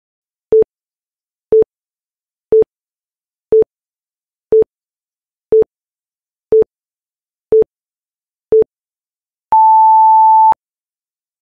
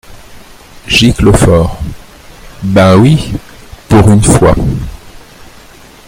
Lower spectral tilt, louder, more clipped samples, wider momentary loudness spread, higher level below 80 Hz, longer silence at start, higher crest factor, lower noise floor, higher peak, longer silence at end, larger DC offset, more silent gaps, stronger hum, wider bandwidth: first, -9.5 dB/octave vs -5.5 dB/octave; second, -12 LUFS vs -8 LUFS; second, under 0.1% vs 0.9%; second, 13 LU vs 16 LU; second, -50 dBFS vs -22 dBFS; first, 0.5 s vs 0.1 s; about the same, 10 dB vs 10 dB; first, under -90 dBFS vs -35 dBFS; second, -4 dBFS vs 0 dBFS; about the same, 0.9 s vs 0.9 s; neither; first, 2.11-2.15 s vs none; neither; second, 2.4 kHz vs 17 kHz